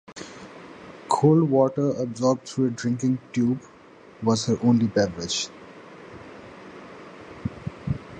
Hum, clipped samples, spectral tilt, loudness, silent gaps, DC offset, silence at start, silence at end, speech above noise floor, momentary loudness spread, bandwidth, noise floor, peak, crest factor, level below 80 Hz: none; under 0.1%; -6 dB/octave; -24 LUFS; none; under 0.1%; 0.1 s; 0 s; 27 dB; 23 LU; 9.8 kHz; -49 dBFS; -6 dBFS; 18 dB; -52 dBFS